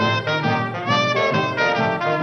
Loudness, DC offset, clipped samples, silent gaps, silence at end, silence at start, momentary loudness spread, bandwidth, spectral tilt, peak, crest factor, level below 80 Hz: -20 LUFS; under 0.1%; under 0.1%; none; 0 s; 0 s; 2 LU; 8 kHz; -5.5 dB/octave; -8 dBFS; 12 dB; -54 dBFS